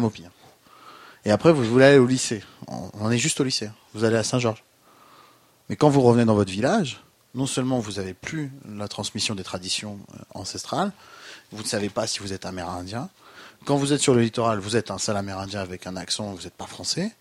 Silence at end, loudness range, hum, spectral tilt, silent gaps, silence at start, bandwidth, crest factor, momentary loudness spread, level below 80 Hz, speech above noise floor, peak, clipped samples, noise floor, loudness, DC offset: 0.1 s; 9 LU; none; -4.5 dB/octave; none; 0 s; 15.5 kHz; 24 dB; 19 LU; -58 dBFS; 32 dB; 0 dBFS; under 0.1%; -55 dBFS; -23 LUFS; under 0.1%